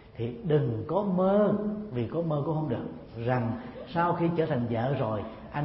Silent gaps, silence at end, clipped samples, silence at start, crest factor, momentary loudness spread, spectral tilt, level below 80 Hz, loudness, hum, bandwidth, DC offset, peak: none; 0 s; under 0.1%; 0 s; 16 dB; 10 LU; -12 dB/octave; -56 dBFS; -29 LUFS; none; 5.8 kHz; under 0.1%; -14 dBFS